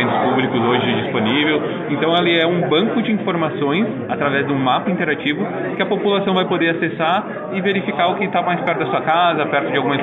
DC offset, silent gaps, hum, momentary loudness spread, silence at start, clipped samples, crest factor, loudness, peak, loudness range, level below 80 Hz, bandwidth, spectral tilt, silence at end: under 0.1%; none; none; 5 LU; 0 s; under 0.1%; 16 dB; -18 LUFS; -2 dBFS; 2 LU; -60 dBFS; 4.1 kHz; -8 dB/octave; 0 s